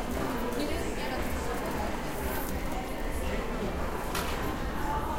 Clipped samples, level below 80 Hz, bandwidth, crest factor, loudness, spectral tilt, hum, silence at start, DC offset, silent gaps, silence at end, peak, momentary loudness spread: under 0.1%; -38 dBFS; 17 kHz; 14 dB; -33 LUFS; -5 dB/octave; none; 0 s; under 0.1%; none; 0 s; -18 dBFS; 2 LU